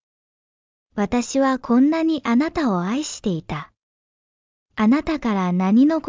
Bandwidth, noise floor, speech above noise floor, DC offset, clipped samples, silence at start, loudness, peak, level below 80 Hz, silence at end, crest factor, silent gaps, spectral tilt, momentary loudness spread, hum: 7.6 kHz; under -90 dBFS; over 71 dB; under 0.1%; under 0.1%; 0.95 s; -20 LUFS; -6 dBFS; -50 dBFS; 0 s; 14 dB; 3.83-4.66 s; -6 dB/octave; 11 LU; none